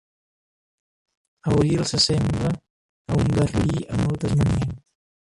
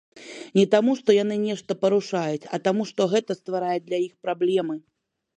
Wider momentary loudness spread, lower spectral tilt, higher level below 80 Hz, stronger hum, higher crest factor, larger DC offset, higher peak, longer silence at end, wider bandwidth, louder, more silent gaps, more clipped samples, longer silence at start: about the same, 10 LU vs 9 LU; about the same, -6 dB/octave vs -6 dB/octave; first, -38 dBFS vs -74 dBFS; neither; about the same, 16 dB vs 20 dB; neither; second, -8 dBFS vs -4 dBFS; about the same, 0.5 s vs 0.6 s; first, 11.5 kHz vs 9.8 kHz; about the same, -22 LUFS vs -24 LUFS; first, 2.70-3.05 s vs none; neither; first, 1.45 s vs 0.15 s